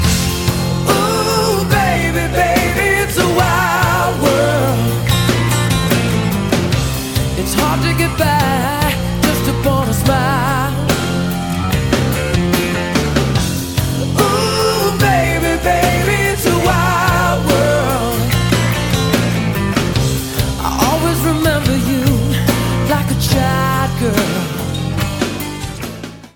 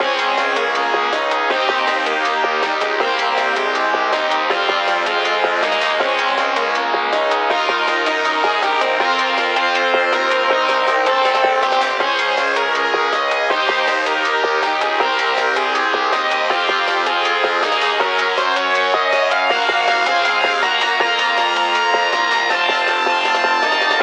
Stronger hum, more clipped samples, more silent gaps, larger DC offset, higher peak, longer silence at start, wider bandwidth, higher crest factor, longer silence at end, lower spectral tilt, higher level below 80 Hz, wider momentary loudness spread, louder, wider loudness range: neither; neither; neither; neither; about the same, 0 dBFS vs -2 dBFS; about the same, 0 s vs 0 s; first, 17.5 kHz vs 10.5 kHz; about the same, 14 dB vs 14 dB; about the same, 0.1 s vs 0 s; first, -5 dB/octave vs -0.5 dB/octave; first, -28 dBFS vs -84 dBFS; first, 5 LU vs 2 LU; about the same, -15 LUFS vs -16 LUFS; about the same, 2 LU vs 2 LU